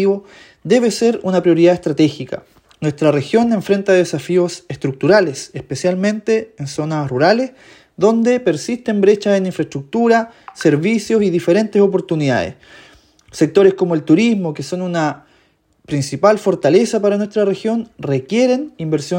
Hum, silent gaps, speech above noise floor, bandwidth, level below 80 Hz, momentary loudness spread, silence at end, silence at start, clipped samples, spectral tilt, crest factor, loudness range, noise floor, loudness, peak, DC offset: none; none; 42 dB; 16.5 kHz; -58 dBFS; 10 LU; 0 s; 0 s; under 0.1%; -6 dB/octave; 16 dB; 2 LU; -57 dBFS; -16 LUFS; 0 dBFS; under 0.1%